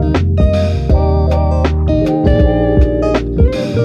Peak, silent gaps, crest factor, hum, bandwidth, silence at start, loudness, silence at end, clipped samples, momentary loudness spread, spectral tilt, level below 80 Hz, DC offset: 0 dBFS; none; 12 dB; none; 7 kHz; 0 s; -13 LUFS; 0 s; under 0.1%; 3 LU; -8.5 dB/octave; -16 dBFS; under 0.1%